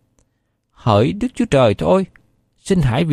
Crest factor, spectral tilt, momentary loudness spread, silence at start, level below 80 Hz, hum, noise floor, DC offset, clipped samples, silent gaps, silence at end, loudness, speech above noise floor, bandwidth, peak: 16 dB; -7 dB/octave; 10 LU; 0.85 s; -38 dBFS; none; -68 dBFS; under 0.1%; under 0.1%; none; 0 s; -17 LUFS; 53 dB; 13 kHz; -2 dBFS